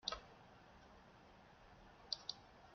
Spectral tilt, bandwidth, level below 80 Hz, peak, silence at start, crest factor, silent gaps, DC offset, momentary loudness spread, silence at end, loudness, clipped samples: -0.5 dB/octave; 6.8 kHz; -70 dBFS; -22 dBFS; 0 s; 32 dB; none; under 0.1%; 18 LU; 0 s; -49 LUFS; under 0.1%